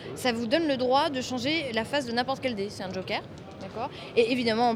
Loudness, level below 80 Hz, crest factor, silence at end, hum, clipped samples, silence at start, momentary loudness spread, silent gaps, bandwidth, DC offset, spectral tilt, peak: -28 LUFS; -60 dBFS; 18 dB; 0 s; none; under 0.1%; 0 s; 11 LU; none; 15.5 kHz; under 0.1%; -4.5 dB/octave; -10 dBFS